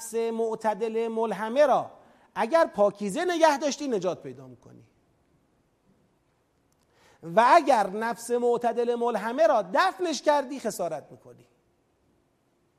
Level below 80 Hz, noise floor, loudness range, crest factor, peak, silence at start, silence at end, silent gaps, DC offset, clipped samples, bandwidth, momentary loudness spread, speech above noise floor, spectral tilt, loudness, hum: -74 dBFS; -69 dBFS; 6 LU; 22 dB; -6 dBFS; 0 s; 1.45 s; none; under 0.1%; under 0.1%; 15 kHz; 11 LU; 44 dB; -4 dB/octave; -25 LUFS; none